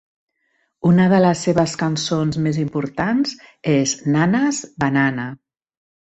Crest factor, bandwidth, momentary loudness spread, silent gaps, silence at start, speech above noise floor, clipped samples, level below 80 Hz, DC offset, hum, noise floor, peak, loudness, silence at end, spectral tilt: 16 dB; 8.4 kHz; 8 LU; none; 0.85 s; 50 dB; under 0.1%; -54 dBFS; under 0.1%; none; -68 dBFS; -4 dBFS; -19 LUFS; 0.75 s; -5.5 dB/octave